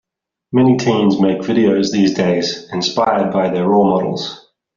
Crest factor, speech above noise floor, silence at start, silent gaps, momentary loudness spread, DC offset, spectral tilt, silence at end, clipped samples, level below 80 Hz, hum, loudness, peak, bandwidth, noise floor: 14 dB; 41 dB; 0.5 s; none; 7 LU; under 0.1%; -5.5 dB/octave; 0.4 s; under 0.1%; -54 dBFS; none; -15 LUFS; 0 dBFS; 7.4 kHz; -55 dBFS